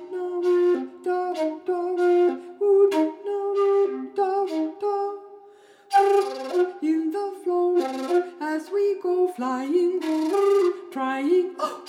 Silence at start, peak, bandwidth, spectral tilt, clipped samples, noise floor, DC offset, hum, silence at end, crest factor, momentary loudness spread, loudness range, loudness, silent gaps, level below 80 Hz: 0 s; -8 dBFS; 12.5 kHz; -4 dB/octave; under 0.1%; -51 dBFS; under 0.1%; none; 0 s; 16 dB; 8 LU; 2 LU; -23 LUFS; none; -88 dBFS